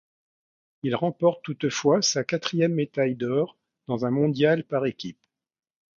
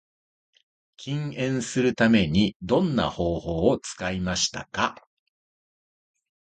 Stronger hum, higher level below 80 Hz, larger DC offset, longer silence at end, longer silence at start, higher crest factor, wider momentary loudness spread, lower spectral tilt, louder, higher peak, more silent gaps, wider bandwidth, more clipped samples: neither; second, -70 dBFS vs -46 dBFS; neither; second, 0.85 s vs 1.55 s; second, 0.85 s vs 1 s; about the same, 18 dB vs 20 dB; about the same, 10 LU vs 10 LU; about the same, -5 dB/octave vs -5 dB/octave; about the same, -25 LUFS vs -25 LUFS; about the same, -8 dBFS vs -6 dBFS; second, none vs 2.56-2.60 s; second, 7.6 kHz vs 9.4 kHz; neither